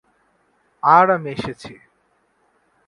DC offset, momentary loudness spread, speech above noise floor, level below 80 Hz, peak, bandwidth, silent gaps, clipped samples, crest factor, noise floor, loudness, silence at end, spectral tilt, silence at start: under 0.1%; 23 LU; 47 dB; -58 dBFS; 0 dBFS; 11 kHz; none; under 0.1%; 22 dB; -64 dBFS; -17 LUFS; 1.15 s; -6.5 dB/octave; 0.85 s